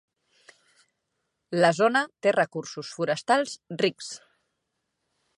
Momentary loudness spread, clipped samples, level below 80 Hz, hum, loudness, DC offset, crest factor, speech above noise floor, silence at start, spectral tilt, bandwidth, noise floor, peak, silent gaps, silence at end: 15 LU; under 0.1%; -80 dBFS; none; -25 LUFS; under 0.1%; 22 dB; 55 dB; 1.5 s; -4.5 dB/octave; 11.5 kHz; -80 dBFS; -6 dBFS; none; 1.25 s